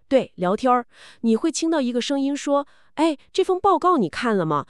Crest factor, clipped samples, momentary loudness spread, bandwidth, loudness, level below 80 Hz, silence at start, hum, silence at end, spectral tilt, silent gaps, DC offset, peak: 16 dB; under 0.1%; 5 LU; 11.5 kHz; -22 LUFS; -60 dBFS; 0.1 s; none; 0.05 s; -5 dB/octave; none; 0.2%; -6 dBFS